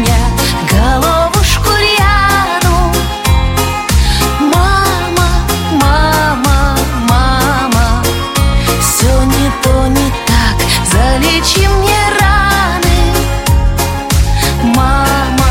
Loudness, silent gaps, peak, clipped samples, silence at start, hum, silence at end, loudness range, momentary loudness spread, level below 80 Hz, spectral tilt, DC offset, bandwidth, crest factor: -10 LUFS; none; 0 dBFS; under 0.1%; 0 s; none; 0 s; 1 LU; 4 LU; -14 dBFS; -4 dB/octave; under 0.1%; 17 kHz; 10 dB